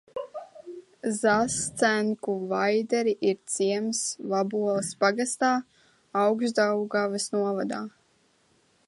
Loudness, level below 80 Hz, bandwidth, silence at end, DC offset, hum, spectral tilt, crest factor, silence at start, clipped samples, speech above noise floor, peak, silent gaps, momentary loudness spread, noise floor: -26 LUFS; -68 dBFS; 11.5 kHz; 1 s; under 0.1%; none; -3.5 dB/octave; 20 dB; 0.15 s; under 0.1%; 40 dB; -8 dBFS; none; 12 LU; -66 dBFS